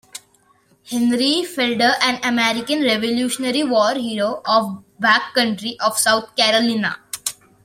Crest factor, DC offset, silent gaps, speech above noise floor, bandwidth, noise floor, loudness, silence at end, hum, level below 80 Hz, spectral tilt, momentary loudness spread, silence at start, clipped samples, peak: 20 dB; under 0.1%; none; 39 dB; 16.5 kHz; -57 dBFS; -18 LUFS; 0.3 s; none; -64 dBFS; -2.5 dB/octave; 10 LU; 0.15 s; under 0.1%; 0 dBFS